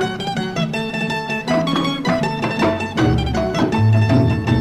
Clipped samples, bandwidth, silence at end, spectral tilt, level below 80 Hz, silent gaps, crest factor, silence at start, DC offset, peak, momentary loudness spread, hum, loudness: under 0.1%; 12.5 kHz; 0 s; -6.5 dB/octave; -36 dBFS; none; 14 dB; 0 s; under 0.1%; -2 dBFS; 6 LU; none; -18 LUFS